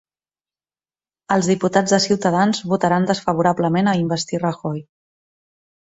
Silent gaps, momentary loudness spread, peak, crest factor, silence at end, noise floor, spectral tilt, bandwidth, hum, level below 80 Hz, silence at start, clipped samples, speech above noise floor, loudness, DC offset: none; 6 LU; -2 dBFS; 18 dB; 1.05 s; under -90 dBFS; -5 dB/octave; 8 kHz; none; -58 dBFS; 1.3 s; under 0.1%; over 72 dB; -19 LUFS; under 0.1%